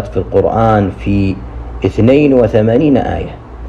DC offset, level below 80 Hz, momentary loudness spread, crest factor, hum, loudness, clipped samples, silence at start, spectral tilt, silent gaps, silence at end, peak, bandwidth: under 0.1%; -28 dBFS; 12 LU; 12 dB; none; -12 LUFS; 0.2%; 0 s; -9 dB/octave; none; 0 s; 0 dBFS; 7.6 kHz